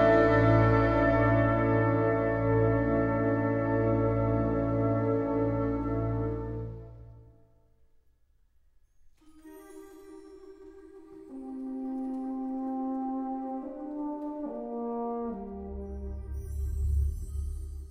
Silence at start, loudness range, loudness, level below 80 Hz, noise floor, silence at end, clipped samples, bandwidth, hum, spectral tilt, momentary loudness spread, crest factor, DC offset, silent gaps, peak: 0 s; 15 LU; -29 LUFS; -40 dBFS; -65 dBFS; 0 s; under 0.1%; 9 kHz; none; -9.5 dB/octave; 18 LU; 20 dB; under 0.1%; none; -10 dBFS